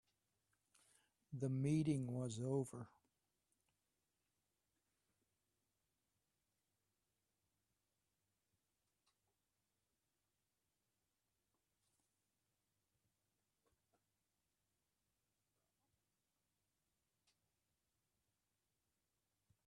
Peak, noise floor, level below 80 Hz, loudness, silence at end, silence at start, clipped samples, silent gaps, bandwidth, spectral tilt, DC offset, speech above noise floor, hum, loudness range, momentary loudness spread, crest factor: -28 dBFS; under -90 dBFS; -84 dBFS; -43 LUFS; 16.8 s; 1.3 s; under 0.1%; none; 12 kHz; -7.5 dB/octave; under 0.1%; over 48 dB; none; 7 LU; 17 LU; 24 dB